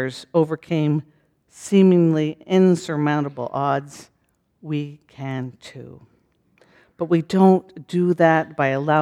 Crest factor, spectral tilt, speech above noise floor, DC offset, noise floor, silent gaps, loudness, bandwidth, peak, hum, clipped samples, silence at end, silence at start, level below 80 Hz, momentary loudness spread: 16 dB; -7.5 dB/octave; 44 dB; under 0.1%; -63 dBFS; none; -20 LUFS; 11 kHz; -4 dBFS; none; under 0.1%; 0 s; 0 s; -66 dBFS; 18 LU